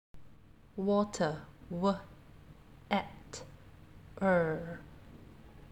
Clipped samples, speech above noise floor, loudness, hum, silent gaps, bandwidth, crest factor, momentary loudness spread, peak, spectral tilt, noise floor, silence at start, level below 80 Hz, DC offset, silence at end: under 0.1%; 26 dB; -34 LUFS; none; none; 10.5 kHz; 22 dB; 24 LU; -14 dBFS; -6 dB/octave; -58 dBFS; 0.15 s; -60 dBFS; under 0.1%; 0.1 s